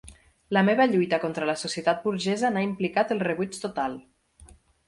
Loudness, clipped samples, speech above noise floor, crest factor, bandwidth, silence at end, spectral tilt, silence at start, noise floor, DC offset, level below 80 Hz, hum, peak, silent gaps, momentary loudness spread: -25 LUFS; under 0.1%; 28 dB; 18 dB; 11.5 kHz; 0.4 s; -5.5 dB/octave; 0.05 s; -53 dBFS; under 0.1%; -60 dBFS; none; -8 dBFS; none; 9 LU